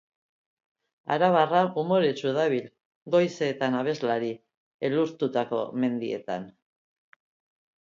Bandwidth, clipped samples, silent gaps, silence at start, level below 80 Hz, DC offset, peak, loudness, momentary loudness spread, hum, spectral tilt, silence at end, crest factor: 7.6 kHz; under 0.1%; 2.85-3.06 s, 4.57-4.79 s; 1.05 s; -74 dBFS; under 0.1%; -8 dBFS; -26 LUFS; 11 LU; none; -6.5 dB/octave; 1.3 s; 20 dB